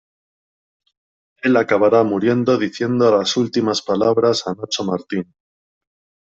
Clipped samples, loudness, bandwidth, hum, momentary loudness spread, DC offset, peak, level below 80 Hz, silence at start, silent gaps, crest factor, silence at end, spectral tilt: under 0.1%; -18 LUFS; 8 kHz; none; 9 LU; under 0.1%; -4 dBFS; -62 dBFS; 1.45 s; none; 16 dB; 1.1 s; -5 dB/octave